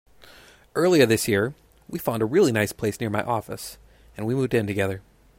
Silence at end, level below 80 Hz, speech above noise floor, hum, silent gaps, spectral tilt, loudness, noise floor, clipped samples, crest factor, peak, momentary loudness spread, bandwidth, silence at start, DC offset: 0.4 s; -56 dBFS; 28 dB; none; none; -5.5 dB/octave; -23 LUFS; -51 dBFS; under 0.1%; 20 dB; -4 dBFS; 16 LU; 16 kHz; 0.75 s; under 0.1%